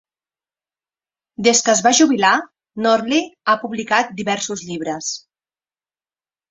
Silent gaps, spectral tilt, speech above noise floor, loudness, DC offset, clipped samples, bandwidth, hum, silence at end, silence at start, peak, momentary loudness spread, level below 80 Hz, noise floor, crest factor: none; -2 dB/octave; over 73 dB; -17 LUFS; under 0.1%; under 0.1%; 8.2 kHz; none; 1.3 s; 1.4 s; 0 dBFS; 12 LU; -64 dBFS; under -90 dBFS; 18 dB